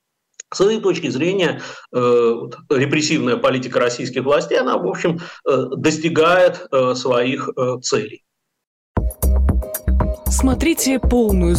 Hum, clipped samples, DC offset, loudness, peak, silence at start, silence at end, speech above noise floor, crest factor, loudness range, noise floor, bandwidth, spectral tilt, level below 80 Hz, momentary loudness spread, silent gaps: none; under 0.1%; under 0.1%; -18 LUFS; -6 dBFS; 0.5 s; 0 s; 27 dB; 10 dB; 3 LU; -44 dBFS; 16 kHz; -5 dB/octave; -26 dBFS; 7 LU; 8.67-8.95 s